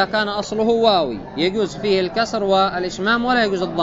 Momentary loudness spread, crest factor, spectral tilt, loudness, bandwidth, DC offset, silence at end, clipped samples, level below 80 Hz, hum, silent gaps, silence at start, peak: 6 LU; 16 dB; -4.5 dB/octave; -19 LUFS; 8 kHz; under 0.1%; 0 s; under 0.1%; -46 dBFS; none; none; 0 s; -2 dBFS